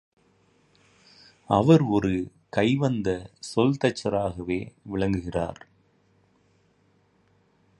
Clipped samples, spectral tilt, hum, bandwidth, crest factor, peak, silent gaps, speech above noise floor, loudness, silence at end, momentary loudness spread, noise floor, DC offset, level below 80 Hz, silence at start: under 0.1%; -7 dB/octave; none; 11.5 kHz; 22 dB; -4 dBFS; none; 40 dB; -25 LUFS; 2.25 s; 12 LU; -64 dBFS; under 0.1%; -50 dBFS; 1.5 s